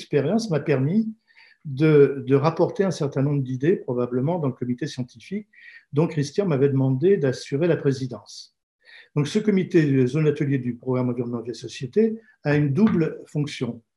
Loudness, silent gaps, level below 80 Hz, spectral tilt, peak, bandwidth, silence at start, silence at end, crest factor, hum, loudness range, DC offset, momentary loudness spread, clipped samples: -23 LUFS; 8.63-8.79 s; -68 dBFS; -7.5 dB/octave; -4 dBFS; 11 kHz; 0 s; 0.15 s; 18 dB; none; 4 LU; under 0.1%; 13 LU; under 0.1%